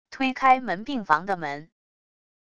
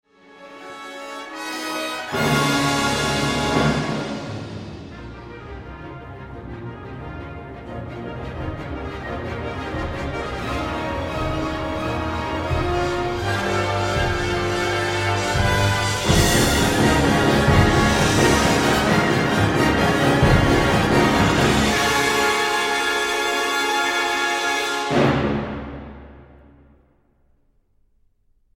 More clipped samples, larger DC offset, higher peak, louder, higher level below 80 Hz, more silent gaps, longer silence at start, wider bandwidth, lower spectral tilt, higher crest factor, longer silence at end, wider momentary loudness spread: neither; neither; about the same, -4 dBFS vs -2 dBFS; second, -24 LUFS vs -20 LUFS; second, -60 dBFS vs -34 dBFS; neither; second, 0.05 s vs 0.35 s; second, 8.4 kHz vs 16.5 kHz; about the same, -5 dB/octave vs -4.5 dB/octave; about the same, 22 dB vs 18 dB; second, 0.7 s vs 2.3 s; second, 12 LU vs 18 LU